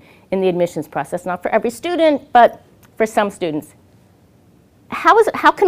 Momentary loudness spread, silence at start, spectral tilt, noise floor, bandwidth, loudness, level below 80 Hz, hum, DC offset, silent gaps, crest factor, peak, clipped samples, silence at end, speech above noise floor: 12 LU; 0.3 s; -5 dB/octave; -51 dBFS; 16 kHz; -17 LUFS; -54 dBFS; none; under 0.1%; none; 18 dB; 0 dBFS; under 0.1%; 0 s; 35 dB